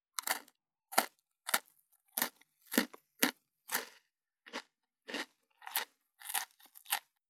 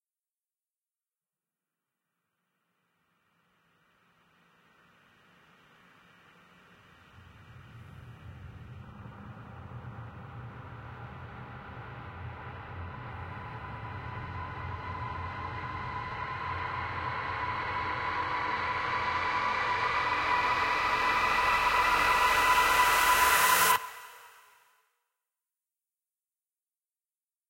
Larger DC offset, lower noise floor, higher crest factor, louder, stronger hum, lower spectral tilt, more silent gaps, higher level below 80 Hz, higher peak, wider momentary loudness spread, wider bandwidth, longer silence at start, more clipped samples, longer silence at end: neither; second, -73 dBFS vs under -90 dBFS; first, 36 dB vs 22 dB; second, -38 LUFS vs -28 LUFS; neither; second, -0.5 dB/octave vs -2 dB/octave; neither; second, under -90 dBFS vs -56 dBFS; first, -4 dBFS vs -12 dBFS; second, 14 LU vs 24 LU; first, over 20 kHz vs 16.5 kHz; second, 0.2 s vs 7.15 s; neither; second, 0.3 s vs 3.2 s